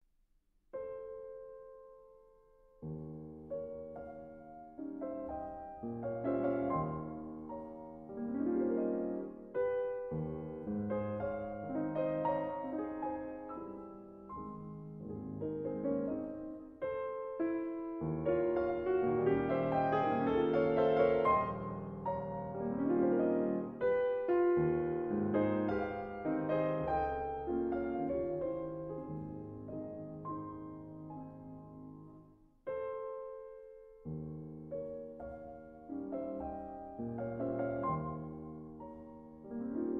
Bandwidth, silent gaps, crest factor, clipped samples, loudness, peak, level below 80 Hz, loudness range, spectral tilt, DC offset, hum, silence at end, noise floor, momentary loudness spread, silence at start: 5.4 kHz; none; 18 dB; under 0.1%; -37 LUFS; -18 dBFS; -62 dBFS; 14 LU; -7.5 dB/octave; under 0.1%; none; 0 s; -73 dBFS; 17 LU; 0.75 s